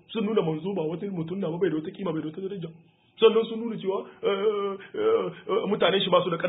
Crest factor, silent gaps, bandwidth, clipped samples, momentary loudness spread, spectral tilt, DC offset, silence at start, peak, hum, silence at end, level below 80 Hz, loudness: 20 dB; none; 4 kHz; under 0.1%; 11 LU; -10 dB/octave; under 0.1%; 0.1 s; -6 dBFS; none; 0 s; -72 dBFS; -27 LUFS